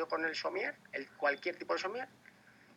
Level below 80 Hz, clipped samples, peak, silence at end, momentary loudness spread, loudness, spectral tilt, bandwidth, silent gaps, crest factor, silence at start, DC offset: -88 dBFS; under 0.1%; -18 dBFS; 0 s; 10 LU; -37 LUFS; -3 dB/octave; 14.5 kHz; none; 20 dB; 0 s; under 0.1%